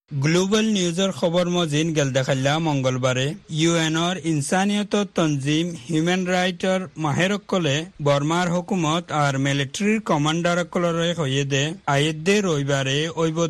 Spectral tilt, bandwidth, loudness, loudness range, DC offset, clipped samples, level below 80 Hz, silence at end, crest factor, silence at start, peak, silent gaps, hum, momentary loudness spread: -5 dB/octave; 12.5 kHz; -21 LUFS; 1 LU; under 0.1%; under 0.1%; -56 dBFS; 0 s; 16 dB; 0.1 s; -6 dBFS; none; none; 3 LU